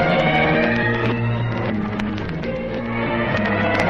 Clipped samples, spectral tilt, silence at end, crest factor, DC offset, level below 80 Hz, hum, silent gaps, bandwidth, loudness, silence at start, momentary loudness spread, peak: under 0.1%; -7.5 dB/octave; 0 s; 16 dB; under 0.1%; -38 dBFS; none; none; 8 kHz; -20 LUFS; 0 s; 9 LU; -4 dBFS